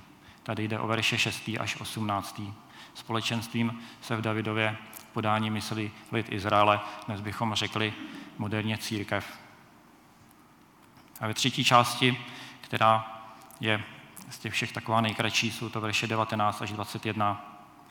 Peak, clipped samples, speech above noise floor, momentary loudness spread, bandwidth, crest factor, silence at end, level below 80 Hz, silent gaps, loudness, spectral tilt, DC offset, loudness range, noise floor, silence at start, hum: -4 dBFS; under 0.1%; 28 dB; 18 LU; 19 kHz; 26 dB; 0.05 s; -70 dBFS; none; -29 LUFS; -4.5 dB/octave; under 0.1%; 6 LU; -57 dBFS; 0 s; none